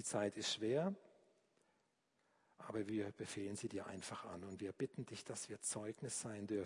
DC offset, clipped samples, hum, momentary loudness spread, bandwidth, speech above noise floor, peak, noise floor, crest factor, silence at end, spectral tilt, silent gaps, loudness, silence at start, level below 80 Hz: under 0.1%; under 0.1%; none; 9 LU; 11 kHz; 37 dB; -28 dBFS; -82 dBFS; 18 dB; 0 s; -4 dB/octave; none; -45 LUFS; 0 s; -84 dBFS